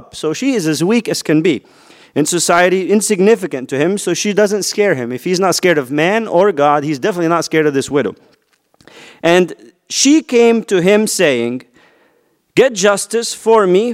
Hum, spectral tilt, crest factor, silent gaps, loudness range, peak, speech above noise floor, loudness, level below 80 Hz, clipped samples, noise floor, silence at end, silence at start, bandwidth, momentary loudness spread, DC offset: none; -4 dB/octave; 14 dB; none; 2 LU; 0 dBFS; 44 dB; -14 LUFS; -60 dBFS; under 0.1%; -58 dBFS; 0 s; 0.15 s; 16 kHz; 7 LU; under 0.1%